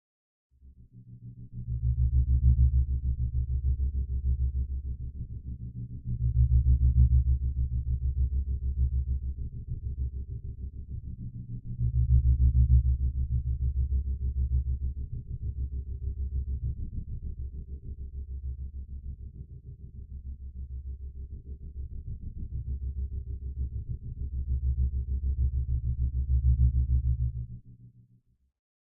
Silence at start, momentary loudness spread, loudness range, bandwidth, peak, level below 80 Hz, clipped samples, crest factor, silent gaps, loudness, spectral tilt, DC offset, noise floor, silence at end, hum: 0.65 s; 18 LU; 14 LU; 0.5 kHz; -12 dBFS; -30 dBFS; under 0.1%; 18 dB; none; -31 LUFS; -18 dB/octave; under 0.1%; -64 dBFS; 1.1 s; none